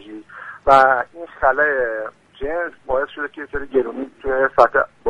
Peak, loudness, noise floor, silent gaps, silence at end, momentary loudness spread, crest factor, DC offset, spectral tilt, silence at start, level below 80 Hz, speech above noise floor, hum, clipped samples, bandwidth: 0 dBFS; -18 LUFS; -37 dBFS; none; 0 s; 17 LU; 20 dB; under 0.1%; -5.5 dB/octave; 0.05 s; -44 dBFS; 19 dB; none; under 0.1%; 10.5 kHz